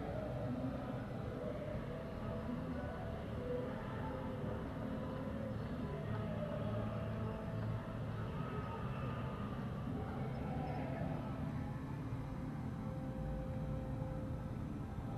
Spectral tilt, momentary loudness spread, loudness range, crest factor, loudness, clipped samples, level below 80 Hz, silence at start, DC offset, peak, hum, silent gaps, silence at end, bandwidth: -8.5 dB/octave; 3 LU; 1 LU; 14 dB; -43 LUFS; under 0.1%; -52 dBFS; 0 s; under 0.1%; -28 dBFS; none; none; 0 s; 13 kHz